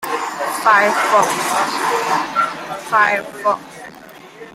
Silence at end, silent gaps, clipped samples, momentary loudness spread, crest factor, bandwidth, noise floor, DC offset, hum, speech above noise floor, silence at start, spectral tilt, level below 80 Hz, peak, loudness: 0.05 s; none; under 0.1%; 15 LU; 16 dB; 16.5 kHz; -39 dBFS; under 0.1%; none; 23 dB; 0 s; -2 dB/octave; -62 dBFS; -2 dBFS; -16 LUFS